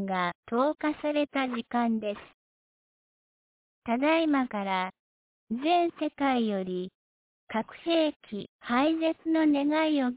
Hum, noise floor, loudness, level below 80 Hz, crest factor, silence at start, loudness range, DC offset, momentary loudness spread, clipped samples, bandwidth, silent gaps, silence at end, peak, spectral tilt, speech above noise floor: none; under -90 dBFS; -28 LUFS; -70 dBFS; 16 dB; 0 s; 3 LU; under 0.1%; 12 LU; under 0.1%; 4 kHz; 0.35-0.43 s, 2.34-3.82 s, 4.99-5.47 s, 6.95-7.47 s, 8.16-8.20 s, 8.49-8.59 s; 0 s; -14 dBFS; -3.5 dB/octave; over 62 dB